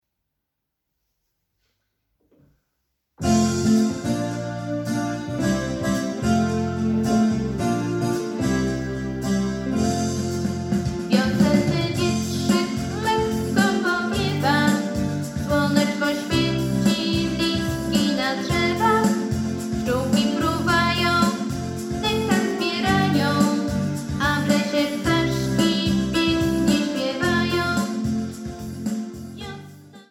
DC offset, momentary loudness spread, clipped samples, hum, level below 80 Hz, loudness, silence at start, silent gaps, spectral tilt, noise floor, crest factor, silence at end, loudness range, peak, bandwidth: under 0.1%; 8 LU; under 0.1%; none; -44 dBFS; -22 LUFS; 3.2 s; none; -5 dB/octave; -80 dBFS; 18 dB; 0.1 s; 3 LU; -6 dBFS; 16.5 kHz